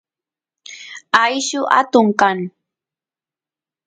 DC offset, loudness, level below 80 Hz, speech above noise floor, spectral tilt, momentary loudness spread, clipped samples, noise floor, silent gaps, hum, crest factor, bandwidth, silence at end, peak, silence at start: under 0.1%; -15 LUFS; -66 dBFS; over 75 dB; -3.5 dB/octave; 20 LU; under 0.1%; under -90 dBFS; none; none; 20 dB; 9.8 kHz; 1.4 s; 0 dBFS; 0.7 s